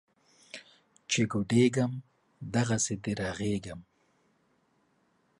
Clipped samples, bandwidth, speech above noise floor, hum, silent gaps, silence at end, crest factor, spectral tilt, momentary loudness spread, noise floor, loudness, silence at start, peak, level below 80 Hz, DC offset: under 0.1%; 11.5 kHz; 42 dB; none; none; 1.6 s; 20 dB; -5 dB/octave; 22 LU; -71 dBFS; -30 LUFS; 0.55 s; -12 dBFS; -60 dBFS; under 0.1%